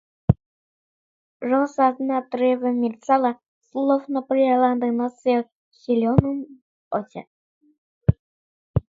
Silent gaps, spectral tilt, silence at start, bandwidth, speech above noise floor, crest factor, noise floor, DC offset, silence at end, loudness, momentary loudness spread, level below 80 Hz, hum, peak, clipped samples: 0.46-1.40 s, 3.48-3.62 s, 5.52-5.71 s, 6.62-6.91 s, 7.27-7.61 s, 7.78-8.01 s, 8.19-8.74 s; -9 dB/octave; 0.3 s; 7.6 kHz; over 69 dB; 22 dB; under -90 dBFS; under 0.1%; 0.2 s; -22 LUFS; 14 LU; -42 dBFS; none; 0 dBFS; under 0.1%